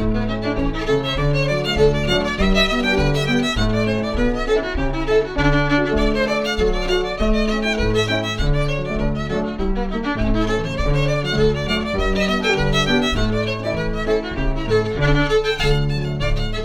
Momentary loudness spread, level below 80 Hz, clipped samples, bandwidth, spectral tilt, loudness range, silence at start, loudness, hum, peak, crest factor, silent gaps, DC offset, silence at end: 6 LU; -24 dBFS; under 0.1%; 12.5 kHz; -5.5 dB/octave; 3 LU; 0 s; -19 LUFS; none; -4 dBFS; 14 dB; none; under 0.1%; 0 s